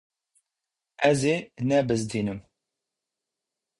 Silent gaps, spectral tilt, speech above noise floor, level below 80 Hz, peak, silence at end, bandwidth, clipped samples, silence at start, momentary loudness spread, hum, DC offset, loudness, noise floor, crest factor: none; -5.5 dB/octave; 62 dB; -60 dBFS; -8 dBFS; 1.4 s; 11.5 kHz; under 0.1%; 1 s; 9 LU; none; under 0.1%; -25 LUFS; -87 dBFS; 22 dB